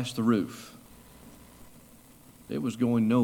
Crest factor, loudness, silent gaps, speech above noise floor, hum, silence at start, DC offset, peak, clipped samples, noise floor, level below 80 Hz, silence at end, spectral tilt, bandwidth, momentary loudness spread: 18 dB; -28 LUFS; none; 28 dB; none; 0 s; under 0.1%; -12 dBFS; under 0.1%; -54 dBFS; -62 dBFS; 0 s; -6.5 dB/octave; 18 kHz; 25 LU